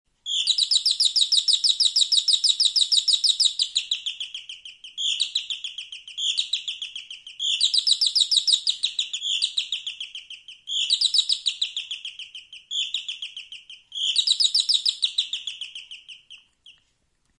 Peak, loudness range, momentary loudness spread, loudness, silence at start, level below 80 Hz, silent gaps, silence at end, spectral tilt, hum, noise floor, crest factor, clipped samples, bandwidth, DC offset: -6 dBFS; 8 LU; 19 LU; -20 LUFS; 0.25 s; -74 dBFS; none; 0.7 s; 6.5 dB/octave; none; -69 dBFS; 18 dB; under 0.1%; 11.5 kHz; under 0.1%